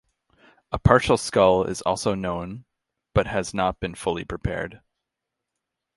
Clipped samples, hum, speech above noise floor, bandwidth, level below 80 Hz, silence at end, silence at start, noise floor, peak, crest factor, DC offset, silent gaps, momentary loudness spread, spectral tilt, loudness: under 0.1%; none; 61 dB; 11.5 kHz; -40 dBFS; 1.2 s; 0.7 s; -84 dBFS; 0 dBFS; 24 dB; under 0.1%; none; 13 LU; -5.5 dB/octave; -23 LUFS